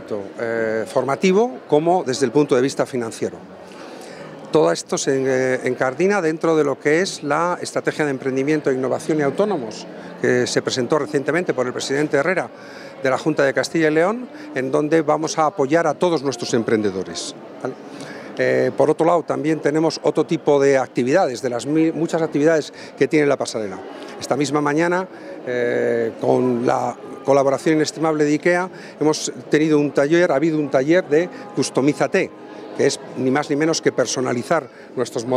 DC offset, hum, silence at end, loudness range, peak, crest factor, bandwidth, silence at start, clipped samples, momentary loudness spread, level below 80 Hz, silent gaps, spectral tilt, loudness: under 0.1%; none; 0 s; 3 LU; -2 dBFS; 18 dB; 13.5 kHz; 0 s; under 0.1%; 12 LU; -70 dBFS; none; -5 dB/octave; -19 LUFS